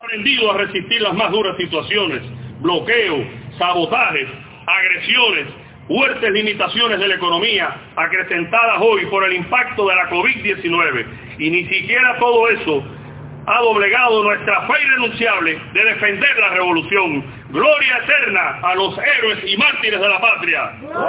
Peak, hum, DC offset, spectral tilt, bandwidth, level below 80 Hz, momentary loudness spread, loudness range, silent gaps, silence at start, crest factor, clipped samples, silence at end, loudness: -2 dBFS; none; under 0.1%; -7 dB/octave; 4 kHz; -52 dBFS; 9 LU; 3 LU; none; 0.05 s; 16 dB; under 0.1%; 0 s; -15 LUFS